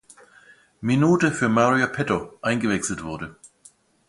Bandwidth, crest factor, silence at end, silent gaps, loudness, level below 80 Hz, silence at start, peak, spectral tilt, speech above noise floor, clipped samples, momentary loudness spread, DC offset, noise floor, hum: 11.5 kHz; 20 dB; 0.75 s; none; -22 LUFS; -54 dBFS; 0.8 s; -4 dBFS; -5.5 dB/octave; 34 dB; under 0.1%; 13 LU; under 0.1%; -55 dBFS; none